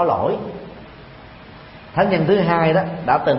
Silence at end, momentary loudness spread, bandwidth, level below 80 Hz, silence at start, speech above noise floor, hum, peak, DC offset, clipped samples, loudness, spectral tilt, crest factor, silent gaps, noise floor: 0 s; 24 LU; 5.8 kHz; -48 dBFS; 0 s; 23 dB; none; -2 dBFS; under 0.1%; under 0.1%; -18 LUFS; -11.5 dB/octave; 18 dB; none; -40 dBFS